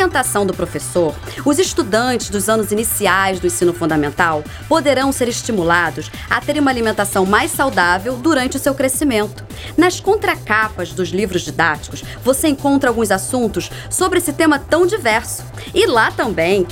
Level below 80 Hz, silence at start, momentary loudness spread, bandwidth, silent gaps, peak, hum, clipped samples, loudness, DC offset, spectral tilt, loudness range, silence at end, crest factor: -38 dBFS; 0 s; 6 LU; 17.5 kHz; none; 0 dBFS; none; under 0.1%; -16 LUFS; under 0.1%; -4 dB/octave; 1 LU; 0 s; 16 dB